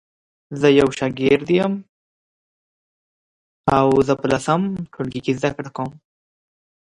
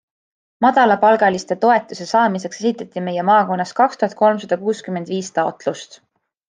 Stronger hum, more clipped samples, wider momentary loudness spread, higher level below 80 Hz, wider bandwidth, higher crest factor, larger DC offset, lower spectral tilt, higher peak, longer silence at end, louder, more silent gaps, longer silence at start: neither; neither; about the same, 13 LU vs 11 LU; first, -50 dBFS vs -66 dBFS; first, 11.5 kHz vs 9.8 kHz; about the same, 20 dB vs 16 dB; neither; first, -6.5 dB/octave vs -5 dB/octave; about the same, 0 dBFS vs -2 dBFS; first, 1.05 s vs 0.65 s; about the same, -19 LUFS vs -17 LUFS; first, 1.89-3.64 s vs none; about the same, 0.5 s vs 0.6 s